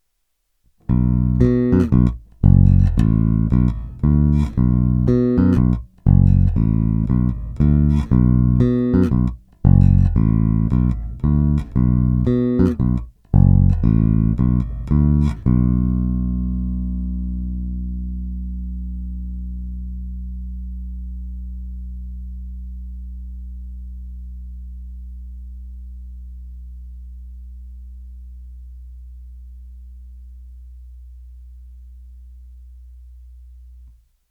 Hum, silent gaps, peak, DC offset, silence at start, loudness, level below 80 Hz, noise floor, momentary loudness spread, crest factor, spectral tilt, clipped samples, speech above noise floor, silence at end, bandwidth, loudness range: 60 Hz at -40 dBFS; none; 0 dBFS; under 0.1%; 0.9 s; -18 LUFS; -24 dBFS; -69 dBFS; 22 LU; 18 dB; -11 dB/octave; under 0.1%; 54 dB; 0.45 s; 5 kHz; 21 LU